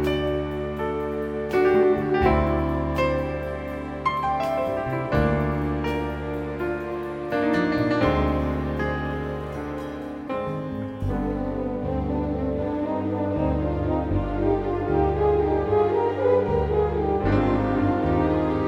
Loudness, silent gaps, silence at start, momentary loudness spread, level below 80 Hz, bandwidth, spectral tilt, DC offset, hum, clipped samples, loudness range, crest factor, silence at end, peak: -24 LUFS; none; 0 s; 9 LU; -34 dBFS; 16 kHz; -8.5 dB/octave; under 0.1%; none; under 0.1%; 6 LU; 18 dB; 0 s; -6 dBFS